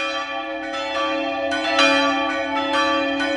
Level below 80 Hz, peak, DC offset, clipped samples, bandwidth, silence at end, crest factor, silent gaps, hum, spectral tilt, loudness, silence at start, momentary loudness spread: -54 dBFS; -2 dBFS; under 0.1%; under 0.1%; 11.5 kHz; 0 s; 18 dB; none; none; -2 dB/octave; -20 LUFS; 0 s; 10 LU